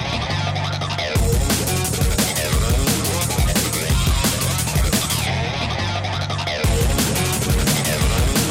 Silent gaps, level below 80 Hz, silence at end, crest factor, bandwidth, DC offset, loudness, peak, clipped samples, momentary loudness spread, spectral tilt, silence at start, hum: none; -26 dBFS; 0 s; 12 dB; 16.5 kHz; under 0.1%; -19 LUFS; -6 dBFS; under 0.1%; 4 LU; -4 dB/octave; 0 s; none